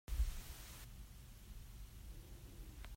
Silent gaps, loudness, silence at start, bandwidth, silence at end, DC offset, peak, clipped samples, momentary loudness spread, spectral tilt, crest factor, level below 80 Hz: none; -52 LUFS; 0.1 s; 16 kHz; 0 s; under 0.1%; -28 dBFS; under 0.1%; 13 LU; -4 dB/octave; 20 dB; -48 dBFS